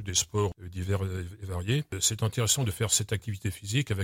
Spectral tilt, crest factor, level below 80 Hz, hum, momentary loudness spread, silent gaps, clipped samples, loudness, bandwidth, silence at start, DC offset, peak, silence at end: -3.5 dB/octave; 22 dB; -50 dBFS; none; 9 LU; none; under 0.1%; -29 LUFS; 16.5 kHz; 0 s; under 0.1%; -8 dBFS; 0 s